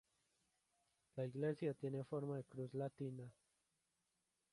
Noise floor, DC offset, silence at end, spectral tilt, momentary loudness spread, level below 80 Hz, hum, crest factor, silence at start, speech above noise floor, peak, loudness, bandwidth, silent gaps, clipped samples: -88 dBFS; under 0.1%; 1.2 s; -8.5 dB/octave; 11 LU; -84 dBFS; none; 18 dB; 1.15 s; 42 dB; -30 dBFS; -47 LUFS; 11.5 kHz; none; under 0.1%